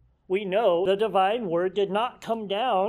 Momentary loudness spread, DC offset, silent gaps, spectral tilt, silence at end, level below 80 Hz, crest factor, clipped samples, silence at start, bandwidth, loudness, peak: 7 LU; under 0.1%; none; -6 dB/octave; 0 s; -64 dBFS; 16 dB; under 0.1%; 0.3 s; 13 kHz; -25 LUFS; -10 dBFS